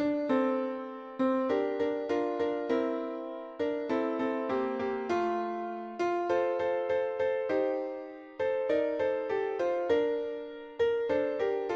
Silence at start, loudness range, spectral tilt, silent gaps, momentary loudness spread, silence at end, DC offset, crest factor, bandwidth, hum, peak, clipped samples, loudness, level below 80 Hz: 0 s; 2 LU; -6 dB/octave; none; 9 LU; 0 s; under 0.1%; 14 dB; 7.4 kHz; none; -16 dBFS; under 0.1%; -31 LUFS; -68 dBFS